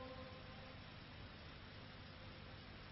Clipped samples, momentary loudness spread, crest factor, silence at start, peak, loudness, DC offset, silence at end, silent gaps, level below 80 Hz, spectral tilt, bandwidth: under 0.1%; 2 LU; 14 dB; 0 s; -42 dBFS; -56 LUFS; under 0.1%; 0 s; none; -64 dBFS; -3.5 dB/octave; 5.6 kHz